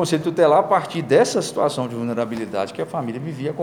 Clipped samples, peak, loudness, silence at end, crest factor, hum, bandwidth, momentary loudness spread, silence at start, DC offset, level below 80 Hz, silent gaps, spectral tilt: under 0.1%; -4 dBFS; -20 LUFS; 0 s; 16 dB; none; 17 kHz; 11 LU; 0 s; under 0.1%; -66 dBFS; none; -5.5 dB/octave